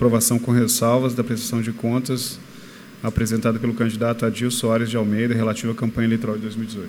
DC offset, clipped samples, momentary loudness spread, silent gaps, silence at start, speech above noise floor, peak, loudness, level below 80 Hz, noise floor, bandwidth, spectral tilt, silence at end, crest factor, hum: under 0.1%; under 0.1%; 10 LU; none; 0 s; 20 dB; -4 dBFS; -21 LUFS; -48 dBFS; -41 dBFS; 18.5 kHz; -5 dB/octave; 0 s; 16 dB; none